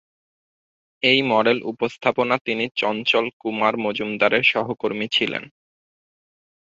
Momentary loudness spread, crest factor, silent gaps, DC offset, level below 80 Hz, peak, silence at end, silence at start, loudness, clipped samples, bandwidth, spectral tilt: 9 LU; 20 dB; 2.41-2.45 s, 3.33-3.40 s; under 0.1%; -66 dBFS; -2 dBFS; 1.15 s; 1.05 s; -20 LUFS; under 0.1%; 7.8 kHz; -5 dB/octave